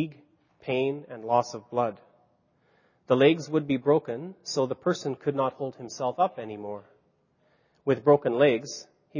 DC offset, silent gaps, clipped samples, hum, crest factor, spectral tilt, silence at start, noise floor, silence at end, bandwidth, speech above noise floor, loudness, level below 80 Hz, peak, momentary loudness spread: under 0.1%; none; under 0.1%; none; 20 dB; -6 dB/octave; 0 s; -68 dBFS; 0 s; 7.4 kHz; 42 dB; -27 LUFS; -72 dBFS; -8 dBFS; 15 LU